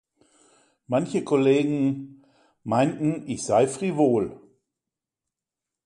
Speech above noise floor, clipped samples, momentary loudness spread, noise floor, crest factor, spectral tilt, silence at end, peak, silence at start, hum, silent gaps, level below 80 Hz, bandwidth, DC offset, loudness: 65 dB; under 0.1%; 11 LU; -88 dBFS; 18 dB; -6.5 dB/octave; 1.5 s; -8 dBFS; 0.9 s; none; none; -64 dBFS; 11.5 kHz; under 0.1%; -24 LUFS